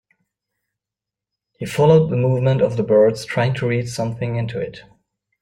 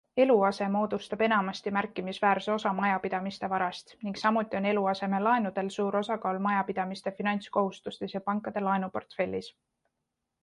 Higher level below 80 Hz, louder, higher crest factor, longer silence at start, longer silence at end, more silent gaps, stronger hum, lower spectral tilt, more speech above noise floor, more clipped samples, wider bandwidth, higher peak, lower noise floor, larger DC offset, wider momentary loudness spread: first, -54 dBFS vs -70 dBFS; first, -18 LUFS vs -29 LUFS; about the same, 18 dB vs 18 dB; first, 1.6 s vs 0.15 s; second, 0.6 s vs 0.95 s; neither; neither; about the same, -7 dB/octave vs -6.5 dB/octave; first, 69 dB vs 55 dB; neither; first, 16 kHz vs 11 kHz; first, -2 dBFS vs -12 dBFS; about the same, -87 dBFS vs -84 dBFS; neither; first, 12 LU vs 8 LU